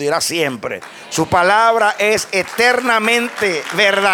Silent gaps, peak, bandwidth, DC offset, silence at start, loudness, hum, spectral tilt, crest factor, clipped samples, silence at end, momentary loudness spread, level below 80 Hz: none; -2 dBFS; 18.5 kHz; under 0.1%; 0 s; -15 LUFS; none; -2.5 dB/octave; 14 dB; under 0.1%; 0 s; 10 LU; -52 dBFS